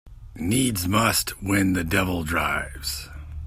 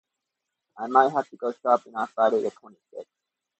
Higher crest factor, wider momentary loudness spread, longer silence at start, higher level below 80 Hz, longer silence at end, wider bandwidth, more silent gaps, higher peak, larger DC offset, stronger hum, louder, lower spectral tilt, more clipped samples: about the same, 20 dB vs 22 dB; second, 10 LU vs 23 LU; second, 0.05 s vs 0.75 s; first, -40 dBFS vs -82 dBFS; second, 0 s vs 0.55 s; first, 16 kHz vs 8.4 kHz; neither; about the same, -6 dBFS vs -4 dBFS; neither; neither; about the same, -23 LUFS vs -24 LUFS; second, -4 dB/octave vs -5.5 dB/octave; neither